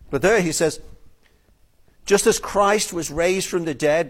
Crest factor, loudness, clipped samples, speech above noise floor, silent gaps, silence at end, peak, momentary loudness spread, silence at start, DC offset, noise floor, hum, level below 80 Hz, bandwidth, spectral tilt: 18 dB; -20 LUFS; under 0.1%; 37 dB; none; 0 s; -4 dBFS; 7 LU; 0.1 s; under 0.1%; -57 dBFS; none; -46 dBFS; 16.5 kHz; -3.5 dB/octave